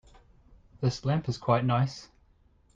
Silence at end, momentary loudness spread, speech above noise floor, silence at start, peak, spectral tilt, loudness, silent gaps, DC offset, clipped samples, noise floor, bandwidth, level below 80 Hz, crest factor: 0.7 s; 7 LU; 36 dB; 0.8 s; -10 dBFS; -7 dB/octave; -29 LUFS; none; under 0.1%; under 0.1%; -63 dBFS; 7.6 kHz; -56 dBFS; 20 dB